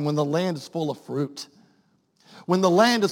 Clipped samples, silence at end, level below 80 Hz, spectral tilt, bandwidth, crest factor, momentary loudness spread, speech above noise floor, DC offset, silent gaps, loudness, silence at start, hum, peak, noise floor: under 0.1%; 0 s; -74 dBFS; -5.5 dB/octave; 17 kHz; 20 dB; 20 LU; 42 dB; under 0.1%; none; -23 LUFS; 0 s; none; -4 dBFS; -64 dBFS